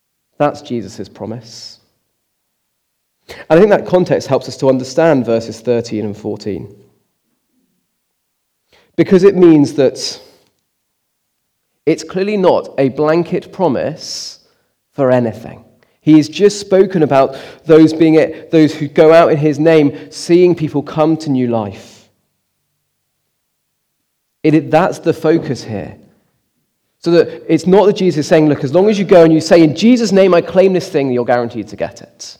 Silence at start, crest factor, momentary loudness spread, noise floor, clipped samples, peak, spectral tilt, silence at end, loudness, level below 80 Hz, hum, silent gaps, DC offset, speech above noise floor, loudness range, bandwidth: 0.4 s; 14 dB; 16 LU; -68 dBFS; 0.4%; 0 dBFS; -6.5 dB/octave; 0.05 s; -12 LUFS; -54 dBFS; none; none; under 0.1%; 56 dB; 10 LU; 12 kHz